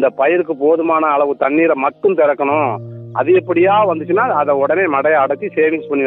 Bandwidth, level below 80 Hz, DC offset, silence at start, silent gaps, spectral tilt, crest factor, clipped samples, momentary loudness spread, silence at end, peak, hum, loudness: 4 kHz; -64 dBFS; under 0.1%; 0 s; none; -10 dB/octave; 12 dB; under 0.1%; 4 LU; 0 s; -2 dBFS; none; -14 LUFS